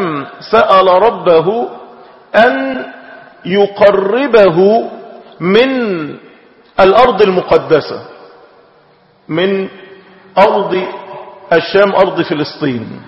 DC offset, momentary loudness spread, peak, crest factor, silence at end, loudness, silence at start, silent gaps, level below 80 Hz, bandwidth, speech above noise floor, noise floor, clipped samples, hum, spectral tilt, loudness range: under 0.1%; 17 LU; 0 dBFS; 12 dB; 0.05 s; -11 LUFS; 0 s; none; -48 dBFS; 6.8 kHz; 38 dB; -48 dBFS; 0.3%; none; -7.5 dB/octave; 5 LU